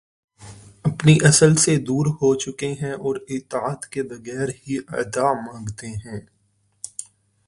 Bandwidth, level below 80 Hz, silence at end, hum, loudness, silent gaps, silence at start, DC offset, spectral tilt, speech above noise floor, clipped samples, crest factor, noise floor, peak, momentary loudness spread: 11.5 kHz; -52 dBFS; 0.45 s; none; -20 LUFS; none; 0.4 s; under 0.1%; -5 dB/octave; 44 dB; under 0.1%; 20 dB; -64 dBFS; 0 dBFS; 20 LU